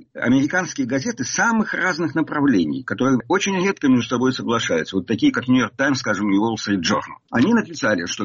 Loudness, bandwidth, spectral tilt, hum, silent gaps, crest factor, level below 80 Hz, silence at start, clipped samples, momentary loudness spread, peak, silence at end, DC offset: -20 LUFS; 7.4 kHz; -4 dB/octave; none; none; 12 dB; -56 dBFS; 0.15 s; under 0.1%; 5 LU; -6 dBFS; 0 s; under 0.1%